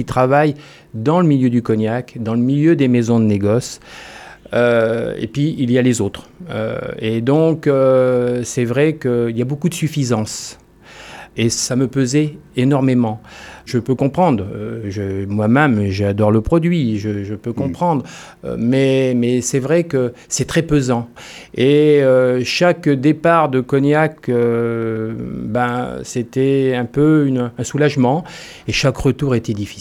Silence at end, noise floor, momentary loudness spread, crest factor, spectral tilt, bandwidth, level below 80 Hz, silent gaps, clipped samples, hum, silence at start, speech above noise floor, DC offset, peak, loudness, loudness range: 0 s; -39 dBFS; 12 LU; 16 dB; -6 dB/octave; 14.5 kHz; -44 dBFS; none; under 0.1%; none; 0 s; 23 dB; under 0.1%; -2 dBFS; -16 LUFS; 4 LU